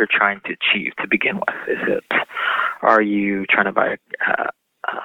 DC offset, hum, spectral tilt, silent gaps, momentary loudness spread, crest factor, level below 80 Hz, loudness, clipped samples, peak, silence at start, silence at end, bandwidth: under 0.1%; none; -6 dB/octave; none; 7 LU; 20 dB; -68 dBFS; -19 LUFS; under 0.1%; 0 dBFS; 0 s; 0 s; 8 kHz